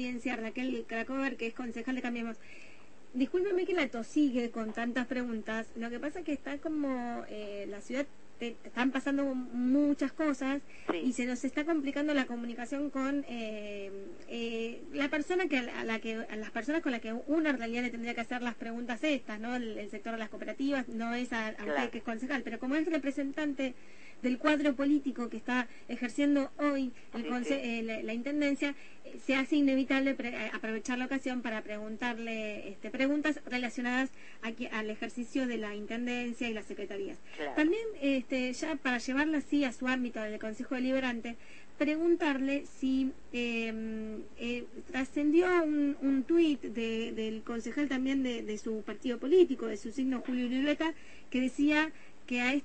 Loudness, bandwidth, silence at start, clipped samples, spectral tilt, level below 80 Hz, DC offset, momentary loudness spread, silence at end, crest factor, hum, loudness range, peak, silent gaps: -33 LUFS; 8.8 kHz; 0 s; under 0.1%; -4.5 dB/octave; -64 dBFS; 0.5%; 11 LU; 0 s; 20 dB; none; 5 LU; -14 dBFS; none